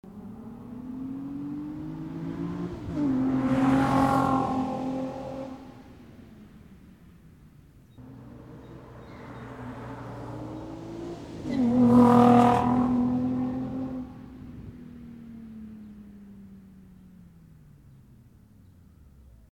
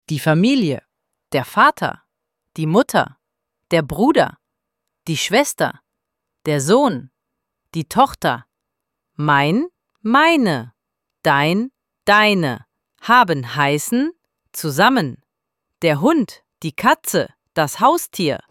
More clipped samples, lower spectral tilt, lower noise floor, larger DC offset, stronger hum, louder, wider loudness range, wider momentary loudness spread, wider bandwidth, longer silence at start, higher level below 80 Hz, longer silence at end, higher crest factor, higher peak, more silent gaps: neither; first, -8 dB/octave vs -4.5 dB/octave; second, -54 dBFS vs -80 dBFS; neither; neither; second, -25 LUFS vs -17 LUFS; first, 23 LU vs 4 LU; first, 26 LU vs 14 LU; second, 11 kHz vs 17 kHz; about the same, 0.05 s vs 0.1 s; about the same, -52 dBFS vs -56 dBFS; first, 2.3 s vs 0.15 s; about the same, 22 dB vs 18 dB; second, -6 dBFS vs 0 dBFS; neither